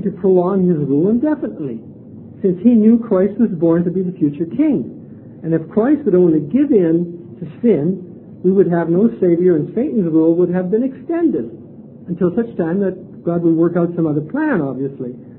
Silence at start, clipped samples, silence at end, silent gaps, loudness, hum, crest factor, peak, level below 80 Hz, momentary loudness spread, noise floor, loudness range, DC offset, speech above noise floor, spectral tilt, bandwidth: 0 s; under 0.1%; 0 s; none; -16 LUFS; none; 14 dB; -2 dBFS; -54 dBFS; 13 LU; -36 dBFS; 3 LU; under 0.1%; 21 dB; -13.5 dB/octave; 3.7 kHz